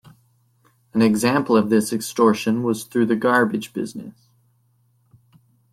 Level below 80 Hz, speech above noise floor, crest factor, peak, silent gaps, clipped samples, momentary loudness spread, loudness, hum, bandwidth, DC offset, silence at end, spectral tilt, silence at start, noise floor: -64 dBFS; 43 dB; 18 dB; -4 dBFS; none; under 0.1%; 12 LU; -20 LUFS; none; 15.5 kHz; under 0.1%; 1.6 s; -5.5 dB/octave; 0.95 s; -62 dBFS